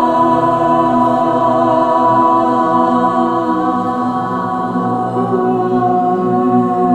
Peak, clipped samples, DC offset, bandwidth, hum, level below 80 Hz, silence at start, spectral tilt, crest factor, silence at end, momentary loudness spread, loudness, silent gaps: -2 dBFS; under 0.1%; under 0.1%; 9 kHz; none; -48 dBFS; 0 s; -8 dB/octave; 12 dB; 0 s; 5 LU; -13 LUFS; none